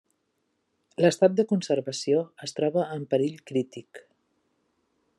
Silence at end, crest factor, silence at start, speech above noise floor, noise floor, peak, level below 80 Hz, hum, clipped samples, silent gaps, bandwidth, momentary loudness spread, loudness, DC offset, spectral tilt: 1.2 s; 20 dB; 1 s; 50 dB; -75 dBFS; -8 dBFS; -78 dBFS; none; under 0.1%; none; 12 kHz; 13 LU; -26 LUFS; under 0.1%; -5.5 dB/octave